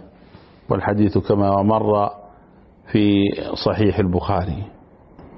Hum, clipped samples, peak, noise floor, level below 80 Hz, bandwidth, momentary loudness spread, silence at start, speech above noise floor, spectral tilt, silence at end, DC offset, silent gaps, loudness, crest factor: none; under 0.1%; -4 dBFS; -49 dBFS; -42 dBFS; 5.8 kHz; 8 LU; 0.7 s; 31 dB; -10.5 dB/octave; 0 s; under 0.1%; none; -19 LUFS; 16 dB